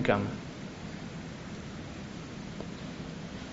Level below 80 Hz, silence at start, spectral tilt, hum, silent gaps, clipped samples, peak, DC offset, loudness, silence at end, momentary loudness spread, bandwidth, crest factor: -54 dBFS; 0 s; -5 dB/octave; none; none; under 0.1%; -10 dBFS; under 0.1%; -39 LUFS; 0 s; 8 LU; 7.6 kHz; 28 dB